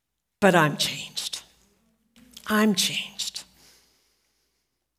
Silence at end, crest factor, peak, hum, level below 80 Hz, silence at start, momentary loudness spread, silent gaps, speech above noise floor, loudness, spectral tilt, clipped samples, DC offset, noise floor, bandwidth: 1.55 s; 24 dB; -4 dBFS; none; -66 dBFS; 0.4 s; 15 LU; none; 55 dB; -24 LUFS; -3.5 dB/octave; under 0.1%; under 0.1%; -77 dBFS; 16 kHz